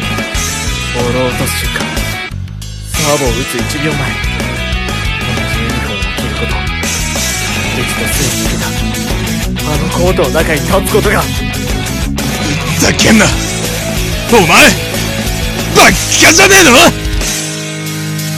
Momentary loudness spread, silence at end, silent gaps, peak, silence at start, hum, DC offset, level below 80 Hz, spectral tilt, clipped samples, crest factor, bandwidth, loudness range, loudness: 11 LU; 0 s; none; 0 dBFS; 0 s; none; under 0.1%; -22 dBFS; -3.5 dB/octave; 0.8%; 12 dB; over 20 kHz; 8 LU; -11 LUFS